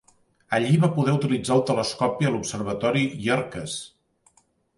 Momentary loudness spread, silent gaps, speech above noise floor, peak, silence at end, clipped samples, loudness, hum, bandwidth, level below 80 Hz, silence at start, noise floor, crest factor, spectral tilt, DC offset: 11 LU; none; 41 dB; -8 dBFS; 0.9 s; under 0.1%; -24 LUFS; none; 11.5 kHz; -58 dBFS; 0.5 s; -64 dBFS; 18 dB; -5.5 dB/octave; under 0.1%